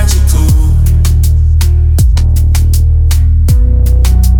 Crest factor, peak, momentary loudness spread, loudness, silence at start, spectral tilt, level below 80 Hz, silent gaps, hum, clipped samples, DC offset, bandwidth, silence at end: 6 dB; 0 dBFS; 1 LU; -9 LUFS; 0 s; -6 dB/octave; -8 dBFS; none; none; under 0.1%; under 0.1%; 18.5 kHz; 0 s